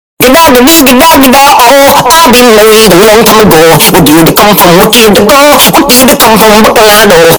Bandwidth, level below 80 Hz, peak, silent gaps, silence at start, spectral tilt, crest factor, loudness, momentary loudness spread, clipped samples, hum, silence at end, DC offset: over 20 kHz; -26 dBFS; 0 dBFS; none; 0.2 s; -3 dB/octave; 2 dB; -1 LUFS; 1 LU; 70%; none; 0 s; under 0.1%